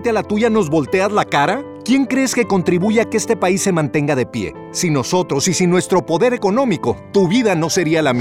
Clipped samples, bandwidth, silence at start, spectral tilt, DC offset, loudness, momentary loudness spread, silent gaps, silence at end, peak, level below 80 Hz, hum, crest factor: under 0.1%; 16.5 kHz; 0 s; -5 dB/octave; under 0.1%; -16 LUFS; 4 LU; none; 0 s; -2 dBFS; -54 dBFS; none; 14 dB